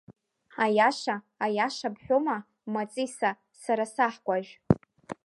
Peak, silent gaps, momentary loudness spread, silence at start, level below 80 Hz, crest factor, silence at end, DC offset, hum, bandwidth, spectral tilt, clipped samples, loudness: -4 dBFS; none; 11 LU; 0.1 s; -56 dBFS; 24 dB; 0.1 s; under 0.1%; none; 11.5 kHz; -5.5 dB/octave; under 0.1%; -28 LUFS